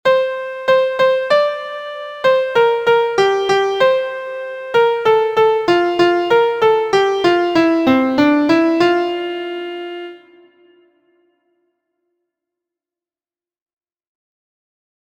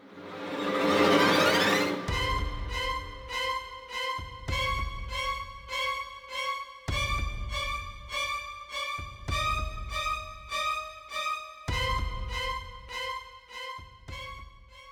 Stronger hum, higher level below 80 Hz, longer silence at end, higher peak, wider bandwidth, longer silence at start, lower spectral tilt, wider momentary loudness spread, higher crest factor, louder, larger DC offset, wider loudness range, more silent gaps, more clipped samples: neither; second, -58 dBFS vs -40 dBFS; first, 4.9 s vs 0 s; first, 0 dBFS vs -10 dBFS; second, 15.5 kHz vs over 20 kHz; about the same, 0.05 s vs 0 s; about the same, -5 dB/octave vs -4 dB/octave; second, 12 LU vs 16 LU; about the same, 16 dB vs 20 dB; first, -15 LUFS vs -30 LUFS; neither; about the same, 9 LU vs 8 LU; neither; neither